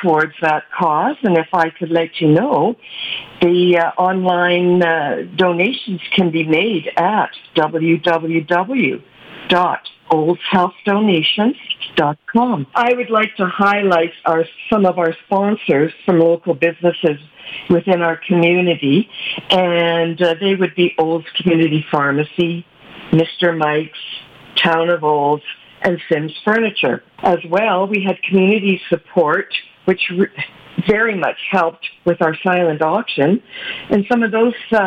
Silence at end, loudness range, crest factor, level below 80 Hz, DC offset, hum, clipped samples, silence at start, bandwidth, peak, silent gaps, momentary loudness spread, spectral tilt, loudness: 0 s; 2 LU; 14 dB; -56 dBFS; under 0.1%; none; under 0.1%; 0 s; 7.4 kHz; -2 dBFS; none; 7 LU; -7.5 dB/octave; -16 LUFS